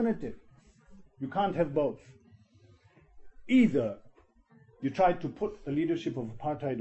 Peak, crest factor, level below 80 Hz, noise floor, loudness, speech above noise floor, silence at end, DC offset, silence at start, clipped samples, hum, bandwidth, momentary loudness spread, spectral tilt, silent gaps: -14 dBFS; 18 dB; -58 dBFS; -62 dBFS; -30 LUFS; 32 dB; 0 s; under 0.1%; 0 s; under 0.1%; none; 8.2 kHz; 12 LU; -8 dB/octave; none